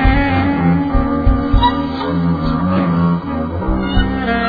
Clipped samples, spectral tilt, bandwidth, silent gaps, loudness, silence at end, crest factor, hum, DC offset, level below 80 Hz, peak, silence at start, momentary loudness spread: under 0.1%; -9.5 dB/octave; 5 kHz; none; -16 LUFS; 0 s; 14 dB; none; under 0.1%; -20 dBFS; 0 dBFS; 0 s; 5 LU